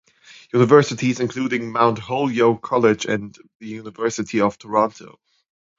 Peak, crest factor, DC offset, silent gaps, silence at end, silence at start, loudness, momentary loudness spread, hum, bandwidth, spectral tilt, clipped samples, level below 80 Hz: 0 dBFS; 20 dB; under 0.1%; 3.55-3.60 s; 0.7 s; 0.55 s; -19 LUFS; 15 LU; none; 7.8 kHz; -6 dB/octave; under 0.1%; -60 dBFS